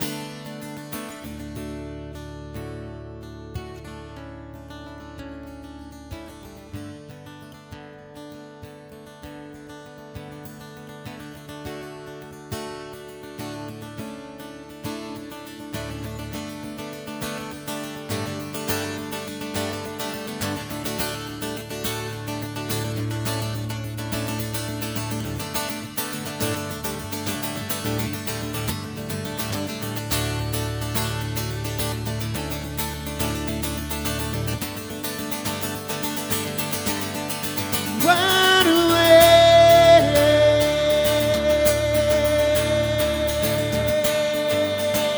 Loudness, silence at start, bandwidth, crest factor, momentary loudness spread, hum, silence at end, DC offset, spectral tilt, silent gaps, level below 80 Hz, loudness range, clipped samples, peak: -22 LUFS; 0 s; over 20 kHz; 22 dB; 23 LU; none; 0 s; under 0.1%; -4 dB/octave; none; -42 dBFS; 24 LU; under 0.1%; -2 dBFS